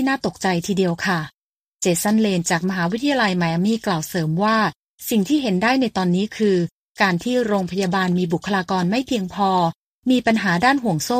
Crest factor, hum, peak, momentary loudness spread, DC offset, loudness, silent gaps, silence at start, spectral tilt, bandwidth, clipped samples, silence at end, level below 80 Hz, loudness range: 16 dB; none; -4 dBFS; 5 LU; under 0.1%; -20 LUFS; 1.34-1.80 s, 4.76-4.98 s, 6.71-6.95 s, 9.76-10.02 s; 0 s; -5 dB/octave; 15.5 kHz; under 0.1%; 0 s; -56 dBFS; 1 LU